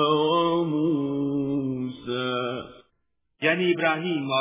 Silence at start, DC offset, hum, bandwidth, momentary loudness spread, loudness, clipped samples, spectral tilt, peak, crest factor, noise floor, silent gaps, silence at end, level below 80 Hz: 0 s; under 0.1%; none; 3.8 kHz; 9 LU; -25 LUFS; under 0.1%; -10 dB/octave; -8 dBFS; 18 dB; -76 dBFS; none; 0 s; -64 dBFS